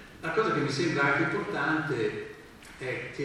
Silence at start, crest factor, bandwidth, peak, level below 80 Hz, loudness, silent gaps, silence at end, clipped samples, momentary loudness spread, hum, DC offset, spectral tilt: 0 s; 18 dB; 13 kHz; -12 dBFS; -60 dBFS; -28 LUFS; none; 0 s; under 0.1%; 15 LU; none; under 0.1%; -5.5 dB/octave